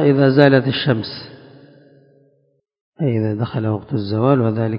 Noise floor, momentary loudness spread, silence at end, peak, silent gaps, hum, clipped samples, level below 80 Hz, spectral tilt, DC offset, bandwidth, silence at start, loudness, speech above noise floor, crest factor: -57 dBFS; 12 LU; 0 s; 0 dBFS; 2.81-2.92 s; none; under 0.1%; -54 dBFS; -10 dB/octave; under 0.1%; 5.4 kHz; 0 s; -17 LUFS; 41 dB; 18 dB